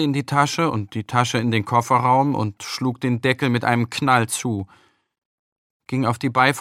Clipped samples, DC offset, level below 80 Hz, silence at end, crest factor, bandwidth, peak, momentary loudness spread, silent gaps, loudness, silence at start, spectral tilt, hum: under 0.1%; under 0.1%; -62 dBFS; 0 s; 20 dB; 15.5 kHz; 0 dBFS; 8 LU; 5.18-5.80 s; -20 LUFS; 0 s; -5 dB/octave; none